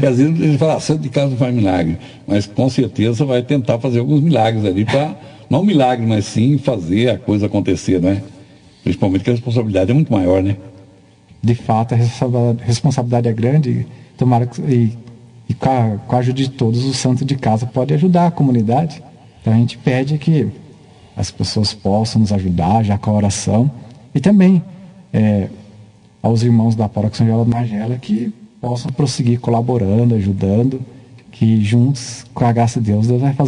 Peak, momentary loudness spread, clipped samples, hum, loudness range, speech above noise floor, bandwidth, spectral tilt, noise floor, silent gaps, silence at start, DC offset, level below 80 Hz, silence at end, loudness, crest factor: 0 dBFS; 8 LU; under 0.1%; none; 2 LU; 31 dB; 10.5 kHz; -7 dB/octave; -45 dBFS; none; 0 s; under 0.1%; -50 dBFS; 0 s; -16 LUFS; 14 dB